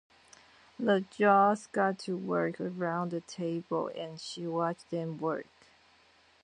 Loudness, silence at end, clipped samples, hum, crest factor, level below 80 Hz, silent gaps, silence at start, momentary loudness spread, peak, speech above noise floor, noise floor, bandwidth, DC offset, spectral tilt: -31 LUFS; 1 s; under 0.1%; none; 22 dB; -78 dBFS; none; 0.8 s; 12 LU; -12 dBFS; 33 dB; -64 dBFS; 10 kHz; under 0.1%; -6 dB/octave